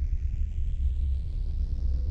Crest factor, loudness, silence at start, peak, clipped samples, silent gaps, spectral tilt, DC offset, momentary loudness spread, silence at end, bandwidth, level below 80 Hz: 10 dB; -32 LUFS; 0 s; -16 dBFS; under 0.1%; none; -8.5 dB/octave; under 0.1%; 3 LU; 0 s; 5 kHz; -28 dBFS